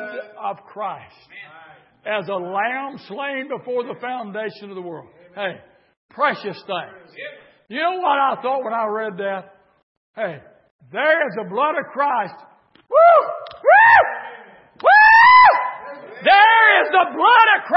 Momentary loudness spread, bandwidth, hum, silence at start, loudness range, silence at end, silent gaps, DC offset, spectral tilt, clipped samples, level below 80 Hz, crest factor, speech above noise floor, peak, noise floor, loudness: 21 LU; 5.8 kHz; none; 0 s; 15 LU; 0 s; 5.97-6.09 s, 9.83-10.14 s, 10.71-10.79 s; under 0.1%; -7.5 dB/octave; under 0.1%; -60 dBFS; 18 dB; 24 dB; 0 dBFS; -43 dBFS; -15 LUFS